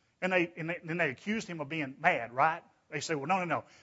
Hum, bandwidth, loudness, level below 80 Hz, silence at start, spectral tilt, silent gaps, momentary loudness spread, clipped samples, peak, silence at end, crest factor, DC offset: none; 8 kHz; -32 LUFS; -76 dBFS; 0.2 s; -5 dB/octave; none; 8 LU; under 0.1%; -12 dBFS; 0.2 s; 22 dB; under 0.1%